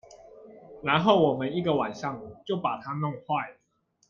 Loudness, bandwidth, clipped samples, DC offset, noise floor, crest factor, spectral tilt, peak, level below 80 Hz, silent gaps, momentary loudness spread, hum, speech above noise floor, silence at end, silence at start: -27 LUFS; 7.2 kHz; under 0.1%; under 0.1%; -71 dBFS; 22 dB; -7 dB/octave; -6 dBFS; -66 dBFS; none; 13 LU; none; 44 dB; 0.6 s; 0.1 s